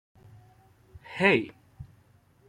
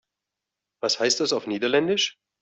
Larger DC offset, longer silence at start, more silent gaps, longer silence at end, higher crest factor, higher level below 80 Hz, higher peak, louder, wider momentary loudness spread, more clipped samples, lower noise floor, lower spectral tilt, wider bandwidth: neither; first, 1.1 s vs 0.85 s; neither; first, 0.65 s vs 0.3 s; first, 28 dB vs 18 dB; first, -64 dBFS vs -72 dBFS; about the same, -4 dBFS vs -6 dBFS; about the same, -24 LUFS vs -23 LUFS; first, 27 LU vs 5 LU; neither; second, -61 dBFS vs -86 dBFS; first, -6 dB/octave vs -2.5 dB/octave; first, 10.5 kHz vs 8.4 kHz